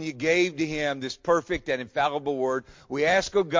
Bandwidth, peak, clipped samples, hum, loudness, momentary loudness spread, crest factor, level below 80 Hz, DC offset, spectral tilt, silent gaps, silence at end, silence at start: 7.6 kHz; -10 dBFS; under 0.1%; none; -26 LUFS; 6 LU; 16 dB; -54 dBFS; under 0.1%; -4.5 dB/octave; none; 0 s; 0 s